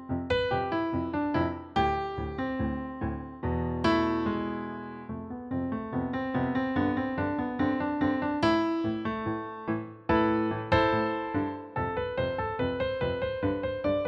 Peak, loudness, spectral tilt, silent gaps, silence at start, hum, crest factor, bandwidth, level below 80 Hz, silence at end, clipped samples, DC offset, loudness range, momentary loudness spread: -12 dBFS; -30 LUFS; -8 dB/octave; none; 0 s; none; 18 dB; 8 kHz; -48 dBFS; 0 s; under 0.1%; under 0.1%; 3 LU; 8 LU